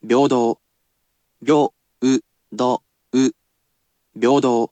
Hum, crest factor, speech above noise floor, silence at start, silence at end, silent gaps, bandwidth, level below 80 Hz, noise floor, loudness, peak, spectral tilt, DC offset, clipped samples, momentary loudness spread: none; 16 dB; 53 dB; 0.05 s; 0.05 s; none; 8.8 kHz; -72 dBFS; -70 dBFS; -19 LUFS; -4 dBFS; -5.5 dB/octave; under 0.1%; under 0.1%; 10 LU